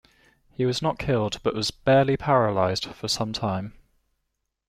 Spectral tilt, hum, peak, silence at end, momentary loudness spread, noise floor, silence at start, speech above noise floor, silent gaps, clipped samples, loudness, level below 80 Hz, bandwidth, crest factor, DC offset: -5 dB/octave; none; -6 dBFS; 0.95 s; 9 LU; -79 dBFS; 0.6 s; 55 dB; none; under 0.1%; -24 LUFS; -50 dBFS; 15.5 kHz; 20 dB; under 0.1%